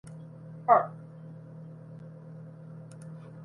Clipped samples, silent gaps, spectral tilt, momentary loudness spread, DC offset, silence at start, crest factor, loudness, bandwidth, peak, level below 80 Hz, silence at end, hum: under 0.1%; none; -8.5 dB/octave; 22 LU; under 0.1%; 0.05 s; 26 dB; -26 LUFS; 11.5 kHz; -8 dBFS; -74 dBFS; 0 s; none